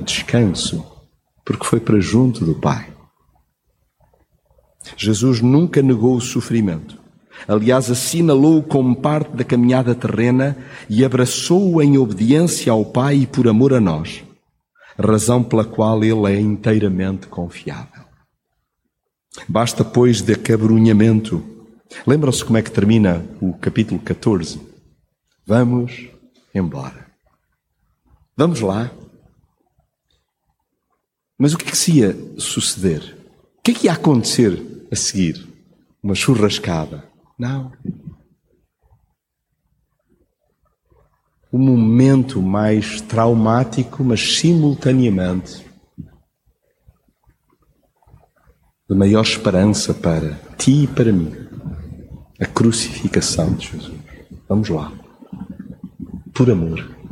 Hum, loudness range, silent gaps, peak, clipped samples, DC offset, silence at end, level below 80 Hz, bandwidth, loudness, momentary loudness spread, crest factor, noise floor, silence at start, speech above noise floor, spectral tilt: none; 9 LU; none; -2 dBFS; under 0.1%; under 0.1%; 0 s; -46 dBFS; 16.5 kHz; -16 LUFS; 17 LU; 16 dB; -75 dBFS; 0 s; 59 dB; -6 dB/octave